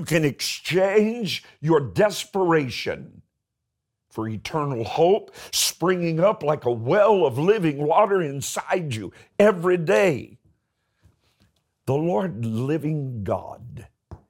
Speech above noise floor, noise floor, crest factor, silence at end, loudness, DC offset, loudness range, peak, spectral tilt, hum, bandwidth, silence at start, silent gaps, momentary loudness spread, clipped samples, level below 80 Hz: 59 dB; -81 dBFS; 18 dB; 0.15 s; -22 LUFS; under 0.1%; 7 LU; -4 dBFS; -5 dB/octave; none; 17 kHz; 0 s; none; 12 LU; under 0.1%; -60 dBFS